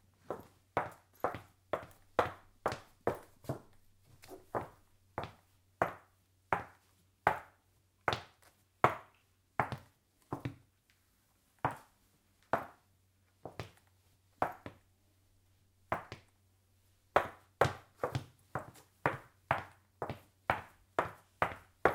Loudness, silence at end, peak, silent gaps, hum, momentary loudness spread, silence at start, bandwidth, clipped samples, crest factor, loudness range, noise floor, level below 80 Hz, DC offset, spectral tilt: -39 LUFS; 0 s; -8 dBFS; none; none; 17 LU; 0.3 s; 16.5 kHz; under 0.1%; 32 dB; 7 LU; -73 dBFS; -66 dBFS; under 0.1%; -5.5 dB/octave